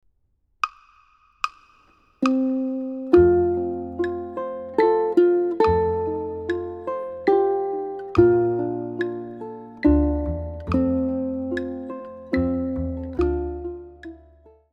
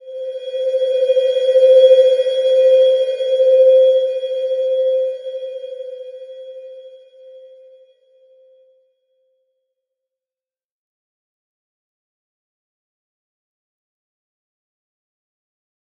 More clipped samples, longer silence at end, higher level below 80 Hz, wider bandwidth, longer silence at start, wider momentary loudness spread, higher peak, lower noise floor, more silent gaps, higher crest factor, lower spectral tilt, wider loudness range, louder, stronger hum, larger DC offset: neither; second, 0.55 s vs 8.6 s; first, -38 dBFS vs under -90 dBFS; about the same, 7.2 kHz vs 7 kHz; first, 0.65 s vs 0.05 s; second, 13 LU vs 22 LU; about the same, -4 dBFS vs -2 dBFS; second, -67 dBFS vs under -90 dBFS; neither; about the same, 20 dB vs 18 dB; first, -8.5 dB/octave vs 0 dB/octave; second, 5 LU vs 21 LU; second, -23 LUFS vs -14 LUFS; neither; neither